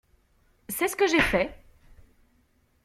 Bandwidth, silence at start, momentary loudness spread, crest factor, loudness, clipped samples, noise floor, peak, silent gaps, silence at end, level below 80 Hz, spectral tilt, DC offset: 16 kHz; 0.7 s; 11 LU; 22 dB; -25 LUFS; under 0.1%; -66 dBFS; -8 dBFS; none; 1.3 s; -48 dBFS; -3.5 dB/octave; under 0.1%